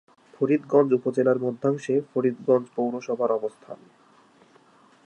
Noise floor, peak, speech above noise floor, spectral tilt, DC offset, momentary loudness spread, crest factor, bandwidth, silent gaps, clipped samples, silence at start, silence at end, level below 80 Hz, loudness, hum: -57 dBFS; -6 dBFS; 33 dB; -8 dB/octave; under 0.1%; 10 LU; 18 dB; 9.4 kHz; none; under 0.1%; 0.4 s; 1.3 s; -78 dBFS; -24 LUFS; none